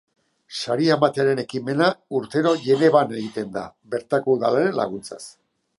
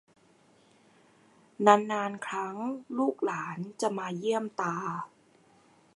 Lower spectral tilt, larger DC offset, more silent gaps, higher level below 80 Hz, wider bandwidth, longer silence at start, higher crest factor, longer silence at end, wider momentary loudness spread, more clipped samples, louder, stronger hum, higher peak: about the same, -6 dB/octave vs -5 dB/octave; neither; neither; first, -66 dBFS vs -84 dBFS; about the same, 11.5 kHz vs 11.5 kHz; second, 0.5 s vs 1.6 s; second, 20 dB vs 28 dB; second, 0.5 s vs 0.9 s; about the same, 15 LU vs 14 LU; neither; first, -21 LUFS vs -30 LUFS; neither; about the same, -2 dBFS vs -4 dBFS